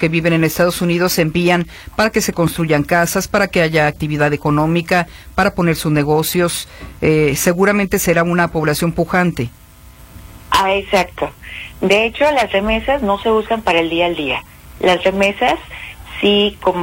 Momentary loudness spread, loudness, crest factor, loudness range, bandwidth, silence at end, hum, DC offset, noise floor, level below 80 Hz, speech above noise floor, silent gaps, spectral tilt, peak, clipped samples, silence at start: 8 LU; -15 LUFS; 16 dB; 2 LU; 16.5 kHz; 0 s; none; under 0.1%; -40 dBFS; -38 dBFS; 25 dB; none; -5 dB/octave; 0 dBFS; under 0.1%; 0 s